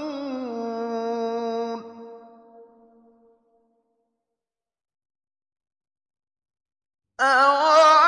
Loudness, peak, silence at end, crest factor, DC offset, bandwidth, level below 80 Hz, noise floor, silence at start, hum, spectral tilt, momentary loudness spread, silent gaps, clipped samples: -21 LUFS; -6 dBFS; 0 s; 20 dB; under 0.1%; 10.5 kHz; -82 dBFS; under -90 dBFS; 0 s; none; -2 dB/octave; 21 LU; none; under 0.1%